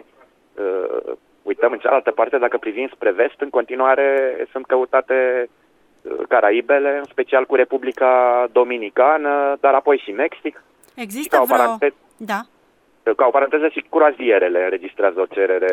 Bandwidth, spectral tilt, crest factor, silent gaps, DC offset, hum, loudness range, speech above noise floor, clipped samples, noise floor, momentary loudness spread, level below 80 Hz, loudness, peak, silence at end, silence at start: 16 kHz; -4 dB/octave; 18 dB; none; under 0.1%; none; 3 LU; 40 dB; under 0.1%; -57 dBFS; 12 LU; -70 dBFS; -18 LUFS; 0 dBFS; 0 s; 0.55 s